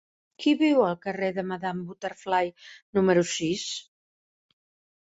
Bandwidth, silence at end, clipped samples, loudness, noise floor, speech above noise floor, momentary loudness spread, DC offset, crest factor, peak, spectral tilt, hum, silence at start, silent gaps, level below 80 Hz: 8 kHz; 1.25 s; under 0.1%; -26 LUFS; under -90 dBFS; over 64 dB; 12 LU; under 0.1%; 18 dB; -8 dBFS; -5 dB/octave; none; 0.4 s; 2.82-2.93 s; -66 dBFS